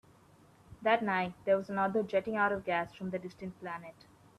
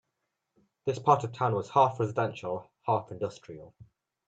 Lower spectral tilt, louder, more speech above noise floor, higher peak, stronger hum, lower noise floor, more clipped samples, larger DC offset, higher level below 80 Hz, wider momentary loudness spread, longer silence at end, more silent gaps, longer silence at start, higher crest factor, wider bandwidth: about the same, -7 dB/octave vs -7 dB/octave; second, -33 LUFS vs -29 LUFS; second, 29 dB vs 54 dB; second, -16 dBFS vs -8 dBFS; neither; second, -61 dBFS vs -83 dBFS; neither; neither; about the same, -68 dBFS vs -70 dBFS; about the same, 14 LU vs 12 LU; about the same, 0.5 s vs 0.6 s; neither; second, 0.7 s vs 0.85 s; about the same, 18 dB vs 22 dB; first, 12.5 kHz vs 8.2 kHz